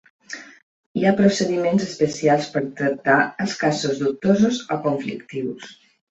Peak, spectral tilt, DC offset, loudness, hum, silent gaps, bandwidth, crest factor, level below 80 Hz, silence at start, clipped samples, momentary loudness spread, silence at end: -2 dBFS; -5.5 dB/octave; under 0.1%; -21 LUFS; none; 0.63-0.95 s; 8 kHz; 18 dB; -60 dBFS; 0.3 s; under 0.1%; 16 LU; 0.35 s